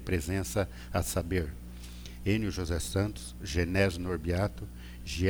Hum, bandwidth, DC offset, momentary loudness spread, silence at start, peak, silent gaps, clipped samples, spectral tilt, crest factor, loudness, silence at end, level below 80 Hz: 60 Hz at -45 dBFS; over 20 kHz; under 0.1%; 15 LU; 0 s; -14 dBFS; none; under 0.1%; -5.5 dB/octave; 18 dB; -32 LUFS; 0 s; -42 dBFS